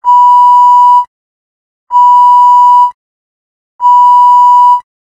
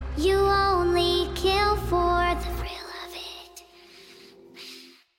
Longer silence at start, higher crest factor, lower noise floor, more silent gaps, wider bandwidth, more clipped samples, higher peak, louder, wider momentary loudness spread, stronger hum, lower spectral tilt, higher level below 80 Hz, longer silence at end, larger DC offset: about the same, 0.05 s vs 0 s; second, 6 dB vs 14 dB; first, under -90 dBFS vs -50 dBFS; first, 1.07-1.87 s, 2.94-3.79 s vs none; second, 9.4 kHz vs 17 kHz; neither; first, 0 dBFS vs -12 dBFS; first, -5 LUFS vs -23 LUFS; second, 9 LU vs 21 LU; neither; second, 2.5 dB/octave vs -5 dB/octave; second, -64 dBFS vs -36 dBFS; about the same, 0.4 s vs 0.35 s; neither